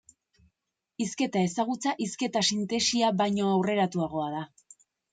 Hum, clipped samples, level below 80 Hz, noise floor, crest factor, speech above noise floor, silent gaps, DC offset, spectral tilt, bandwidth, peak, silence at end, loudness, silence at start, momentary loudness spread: none; under 0.1%; -68 dBFS; -84 dBFS; 16 dB; 56 dB; none; under 0.1%; -4 dB/octave; 9.4 kHz; -12 dBFS; 0.65 s; -28 LUFS; 1 s; 9 LU